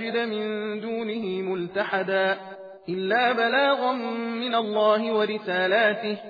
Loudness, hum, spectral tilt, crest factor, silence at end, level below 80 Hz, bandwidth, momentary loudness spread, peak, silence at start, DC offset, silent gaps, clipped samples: -25 LUFS; none; -7 dB/octave; 16 dB; 0 s; -80 dBFS; 5 kHz; 9 LU; -8 dBFS; 0 s; under 0.1%; none; under 0.1%